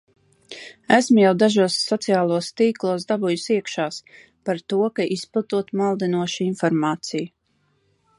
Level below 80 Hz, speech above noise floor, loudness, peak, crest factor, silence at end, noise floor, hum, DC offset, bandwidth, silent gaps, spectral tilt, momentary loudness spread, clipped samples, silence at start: -70 dBFS; 46 dB; -21 LUFS; -2 dBFS; 20 dB; 0.9 s; -66 dBFS; none; under 0.1%; 11.5 kHz; none; -5 dB/octave; 14 LU; under 0.1%; 0.5 s